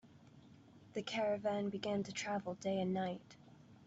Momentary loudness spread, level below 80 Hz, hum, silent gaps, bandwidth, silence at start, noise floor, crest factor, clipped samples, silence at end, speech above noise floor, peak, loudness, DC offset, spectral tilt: 11 LU; -78 dBFS; none; none; 8 kHz; 0.05 s; -62 dBFS; 14 dB; under 0.1%; 0 s; 22 dB; -26 dBFS; -40 LUFS; under 0.1%; -5 dB/octave